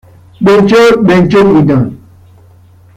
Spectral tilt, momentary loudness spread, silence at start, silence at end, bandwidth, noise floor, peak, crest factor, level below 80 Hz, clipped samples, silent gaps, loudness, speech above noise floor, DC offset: -7 dB/octave; 7 LU; 0.4 s; 1 s; 14.5 kHz; -40 dBFS; 0 dBFS; 8 dB; -40 dBFS; under 0.1%; none; -7 LUFS; 34 dB; under 0.1%